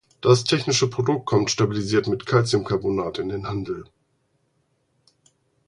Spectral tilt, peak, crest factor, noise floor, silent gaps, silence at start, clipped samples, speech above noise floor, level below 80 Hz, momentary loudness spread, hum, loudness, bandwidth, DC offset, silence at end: -5 dB/octave; -2 dBFS; 22 dB; -69 dBFS; none; 0.25 s; under 0.1%; 47 dB; -52 dBFS; 10 LU; none; -22 LUFS; 11 kHz; under 0.1%; 1.85 s